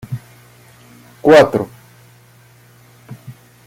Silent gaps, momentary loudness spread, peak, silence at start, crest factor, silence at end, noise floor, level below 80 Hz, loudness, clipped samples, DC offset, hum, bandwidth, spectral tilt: none; 27 LU; 0 dBFS; 0.1 s; 18 dB; 0.35 s; -47 dBFS; -54 dBFS; -12 LUFS; under 0.1%; under 0.1%; 60 Hz at -45 dBFS; 16 kHz; -6 dB/octave